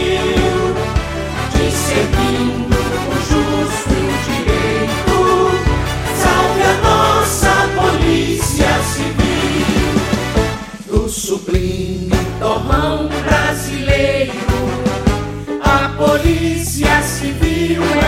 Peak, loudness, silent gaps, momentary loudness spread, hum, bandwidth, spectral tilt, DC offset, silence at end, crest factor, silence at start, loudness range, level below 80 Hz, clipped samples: 0 dBFS; -15 LUFS; none; 6 LU; none; 16.5 kHz; -5 dB/octave; under 0.1%; 0 s; 14 dB; 0 s; 4 LU; -24 dBFS; under 0.1%